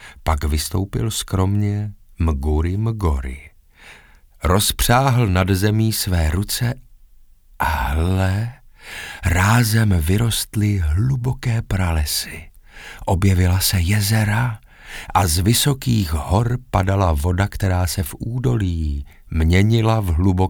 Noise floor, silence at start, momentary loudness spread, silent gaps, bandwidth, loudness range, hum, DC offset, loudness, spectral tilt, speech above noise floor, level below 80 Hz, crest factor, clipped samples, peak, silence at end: -47 dBFS; 0 s; 11 LU; none; over 20 kHz; 4 LU; none; under 0.1%; -19 LUFS; -5 dB/octave; 29 dB; -30 dBFS; 16 dB; under 0.1%; -2 dBFS; 0 s